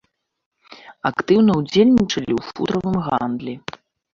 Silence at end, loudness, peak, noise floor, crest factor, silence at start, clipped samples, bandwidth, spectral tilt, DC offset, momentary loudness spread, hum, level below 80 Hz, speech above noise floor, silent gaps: 0.55 s; -19 LUFS; -4 dBFS; -44 dBFS; 16 dB; 0.7 s; under 0.1%; 7.4 kHz; -6.5 dB/octave; under 0.1%; 13 LU; none; -50 dBFS; 26 dB; none